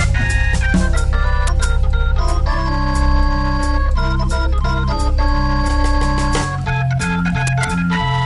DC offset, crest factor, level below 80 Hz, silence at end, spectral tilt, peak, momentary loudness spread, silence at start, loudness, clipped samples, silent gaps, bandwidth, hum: under 0.1%; 12 dB; -16 dBFS; 0 s; -5.5 dB/octave; -4 dBFS; 2 LU; 0 s; -18 LUFS; under 0.1%; none; 11.5 kHz; none